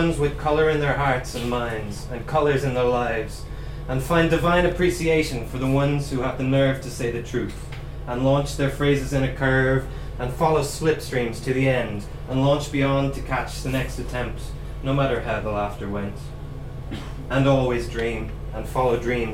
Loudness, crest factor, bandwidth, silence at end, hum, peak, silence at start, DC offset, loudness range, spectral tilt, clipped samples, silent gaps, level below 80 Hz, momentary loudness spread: -23 LUFS; 18 dB; 16 kHz; 0 s; none; -6 dBFS; 0 s; under 0.1%; 4 LU; -6 dB/octave; under 0.1%; none; -34 dBFS; 13 LU